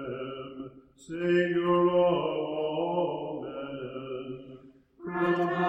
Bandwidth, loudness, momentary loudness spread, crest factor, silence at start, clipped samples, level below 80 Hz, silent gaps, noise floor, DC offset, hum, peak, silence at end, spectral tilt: 8.4 kHz; -29 LUFS; 18 LU; 16 dB; 0 s; under 0.1%; -66 dBFS; none; -52 dBFS; under 0.1%; none; -14 dBFS; 0 s; -7.5 dB/octave